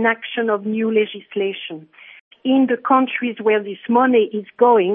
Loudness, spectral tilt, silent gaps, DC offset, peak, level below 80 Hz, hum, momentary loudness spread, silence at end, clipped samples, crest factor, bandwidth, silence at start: -18 LUFS; -10 dB/octave; 2.21-2.31 s; under 0.1%; -2 dBFS; -76 dBFS; none; 9 LU; 0 s; under 0.1%; 16 dB; 3.8 kHz; 0 s